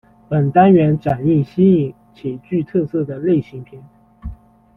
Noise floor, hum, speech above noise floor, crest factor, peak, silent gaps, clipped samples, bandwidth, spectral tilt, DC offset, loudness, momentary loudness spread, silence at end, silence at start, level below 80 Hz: -34 dBFS; none; 19 dB; 16 dB; -2 dBFS; none; under 0.1%; 4.2 kHz; -11 dB/octave; under 0.1%; -16 LUFS; 24 LU; 0.45 s; 0.3 s; -44 dBFS